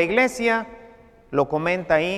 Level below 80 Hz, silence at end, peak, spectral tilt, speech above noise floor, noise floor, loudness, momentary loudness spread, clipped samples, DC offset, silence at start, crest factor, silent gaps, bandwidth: -52 dBFS; 0 s; -4 dBFS; -5 dB/octave; 27 dB; -48 dBFS; -22 LUFS; 7 LU; under 0.1%; under 0.1%; 0 s; 18 dB; none; 14 kHz